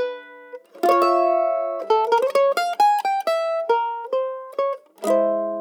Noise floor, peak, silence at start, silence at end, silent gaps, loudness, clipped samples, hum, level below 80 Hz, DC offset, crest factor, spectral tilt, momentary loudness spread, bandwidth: -41 dBFS; -6 dBFS; 0 s; 0 s; none; -21 LUFS; under 0.1%; none; under -90 dBFS; under 0.1%; 16 dB; -3.5 dB/octave; 10 LU; 19.5 kHz